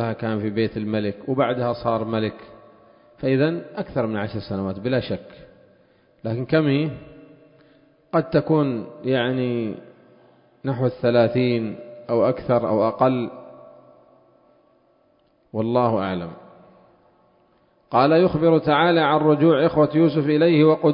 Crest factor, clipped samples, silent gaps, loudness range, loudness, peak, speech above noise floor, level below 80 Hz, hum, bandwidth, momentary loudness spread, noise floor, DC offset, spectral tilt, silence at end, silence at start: 18 dB; under 0.1%; none; 9 LU; -21 LUFS; -4 dBFS; 41 dB; -54 dBFS; none; 5.4 kHz; 13 LU; -61 dBFS; under 0.1%; -12 dB/octave; 0 s; 0 s